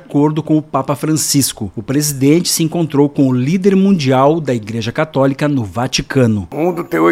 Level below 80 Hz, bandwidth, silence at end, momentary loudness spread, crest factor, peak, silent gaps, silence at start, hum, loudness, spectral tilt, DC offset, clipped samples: -46 dBFS; 16.5 kHz; 0 s; 6 LU; 14 dB; 0 dBFS; none; 0.1 s; none; -14 LUFS; -5 dB/octave; under 0.1%; under 0.1%